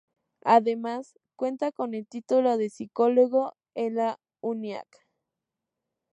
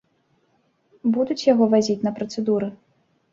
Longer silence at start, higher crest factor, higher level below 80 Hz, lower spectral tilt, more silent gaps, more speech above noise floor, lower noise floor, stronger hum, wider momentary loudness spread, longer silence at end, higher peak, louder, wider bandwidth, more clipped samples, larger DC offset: second, 0.45 s vs 1.05 s; about the same, 20 dB vs 18 dB; second, -84 dBFS vs -64 dBFS; about the same, -6 dB/octave vs -6 dB/octave; neither; first, 61 dB vs 45 dB; first, -86 dBFS vs -66 dBFS; neither; first, 13 LU vs 9 LU; first, 1.3 s vs 0.6 s; about the same, -6 dBFS vs -4 dBFS; second, -27 LUFS vs -21 LUFS; first, 10.5 kHz vs 7.6 kHz; neither; neither